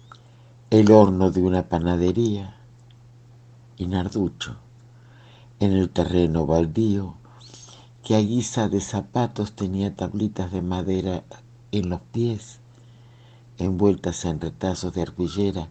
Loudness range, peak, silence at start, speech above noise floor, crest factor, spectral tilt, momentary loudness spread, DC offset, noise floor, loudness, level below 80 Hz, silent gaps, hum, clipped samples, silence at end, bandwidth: 8 LU; 0 dBFS; 0.7 s; 27 dB; 24 dB; -7 dB/octave; 12 LU; under 0.1%; -49 dBFS; -23 LUFS; -46 dBFS; none; none; under 0.1%; 0 s; 8.8 kHz